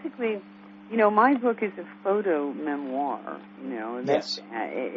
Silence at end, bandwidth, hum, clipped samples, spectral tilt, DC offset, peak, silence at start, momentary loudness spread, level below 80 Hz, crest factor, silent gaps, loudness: 0 s; 7.8 kHz; none; under 0.1%; -5.5 dB/octave; under 0.1%; -8 dBFS; 0 s; 14 LU; -80 dBFS; 20 dB; none; -27 LUFS